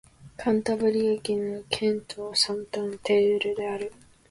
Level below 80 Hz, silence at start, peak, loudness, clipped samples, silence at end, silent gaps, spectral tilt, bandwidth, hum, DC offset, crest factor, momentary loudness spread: -60 dBFS; 0.2 s; -8 dBFS; -26 LUFS; under 0.1%; 0.35 s; none; -4 dB/octave; 11.5 kHz; none; under 0.1%; 18 dB; 9 LU